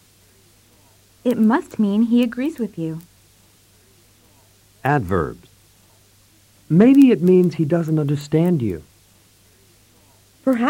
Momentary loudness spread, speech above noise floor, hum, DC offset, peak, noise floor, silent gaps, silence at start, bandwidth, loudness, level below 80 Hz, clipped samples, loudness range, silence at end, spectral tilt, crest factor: 14 LU; 37 dB; none; under 0.1%; -4 dBFS; -54 dBFS; none; 1.25 s; 16.5 kHz; -18 LUFS; -52 dBFS; under 0.1%; 10 LU; 0 s; -8 dB/octave; 16 dB